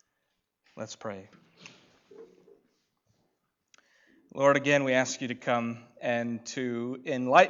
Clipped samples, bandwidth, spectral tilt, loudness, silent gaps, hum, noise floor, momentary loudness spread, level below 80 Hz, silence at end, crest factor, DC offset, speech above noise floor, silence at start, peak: under 0.1%; 7.6 kHz; -4.5 dB/octave; -29 LUFS; none; none; -80 dBFS; 17 LU; -80 dBFS; 0 s; 24 dB; under 0.1%; 52 dB; 0.75 s; -6 dBFS